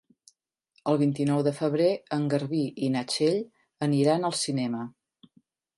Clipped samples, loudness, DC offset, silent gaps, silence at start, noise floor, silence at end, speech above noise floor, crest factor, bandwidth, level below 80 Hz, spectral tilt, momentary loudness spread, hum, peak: under 0.1%; -27 LUFS; under 0.1%; none; 0.85 s; -69 dBFS; 0.9 s; 43 dB; 18 dB; 11.5 kHz; -74 dBFS; -6 dB/octave; 8 LU; none; -10 dBFS